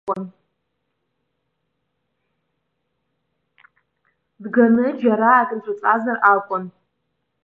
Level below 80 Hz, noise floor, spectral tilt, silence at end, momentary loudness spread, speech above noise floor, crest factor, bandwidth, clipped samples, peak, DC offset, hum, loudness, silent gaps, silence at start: -74 dBFS; -75 dBFS; -9 dB/octave; 0.75 s; 15 LU; 57 dB; 20 dB; 3.7 kHz; under 0.1%; -2 dBFS; under 0.1%; none; -18 LUFS; none; 0.05 s